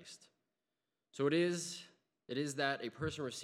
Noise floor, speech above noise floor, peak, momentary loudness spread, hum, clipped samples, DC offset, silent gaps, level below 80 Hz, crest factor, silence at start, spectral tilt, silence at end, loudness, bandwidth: under -90 dBFS; over 53 dB; -20 dBFS; 20 LU; none; under 0.1%; under 0.1%; none; -72 dBFS; 20 dB; 0 s; -4.5 dB/octave; 0 s; -38 LUFS; 14 kHz